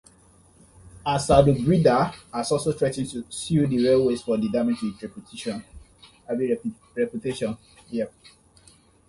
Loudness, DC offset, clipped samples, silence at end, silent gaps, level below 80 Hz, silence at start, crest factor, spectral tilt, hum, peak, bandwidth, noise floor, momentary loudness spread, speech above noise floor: -24 LUFS; under 0.1%; under 0.1%; 1 s; none; -46 dBFS; 0.85 s; 22 dB; -6.5 dB/octave; none; -4 dBFS; 11.5 kHz; -56 dBFS; 14 LU; 32 dB